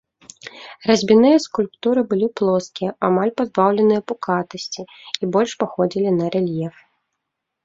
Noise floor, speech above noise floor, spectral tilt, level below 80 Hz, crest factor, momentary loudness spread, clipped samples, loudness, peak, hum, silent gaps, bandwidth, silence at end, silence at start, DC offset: -79 dBFS; 60 dB; -6 dB/octave; -62 dBFS; 18 dB; 15 LU; under 0.1%; -19 LUFS; -2 dBFS; none; none; 7.8 kHz; 0.95 s; 0.45 s; under 0.1%